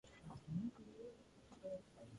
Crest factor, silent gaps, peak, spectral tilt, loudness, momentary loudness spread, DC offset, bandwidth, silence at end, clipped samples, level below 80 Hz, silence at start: 18 dB; none; -34 dBFS; -8 dB/octave; -52 LUFS; 13 LU; under 0.1%; 11 kHz; 0 s; under 0.1%; -72 dBFS; 0.05 s